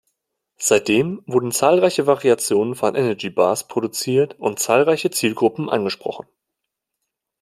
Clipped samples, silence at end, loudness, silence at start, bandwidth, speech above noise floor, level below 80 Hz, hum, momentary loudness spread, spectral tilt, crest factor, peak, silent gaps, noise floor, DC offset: under 0.1%; 1.2 s; -19 LUFS; 0.6 s; 16 kHz; 62 dB; -64 dBFS; none; 7 LU; -4 dB/octave; 18 dB; -2 dBFS; none; -81 dBFS; under 0.1%